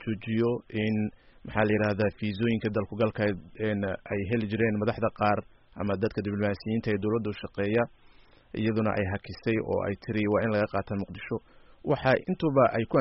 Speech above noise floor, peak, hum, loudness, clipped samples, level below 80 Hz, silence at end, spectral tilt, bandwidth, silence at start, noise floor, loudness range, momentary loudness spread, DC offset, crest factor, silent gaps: 28 dB; -10 dBFS; none; -29 LUFS; under 0.1%; -54 dBFS; 0 s; -6 dB/octave; 5.8 kHz; 0 s; -55 dBFS; 2 LU; 9 LU; under 0.1%; 18 dB; none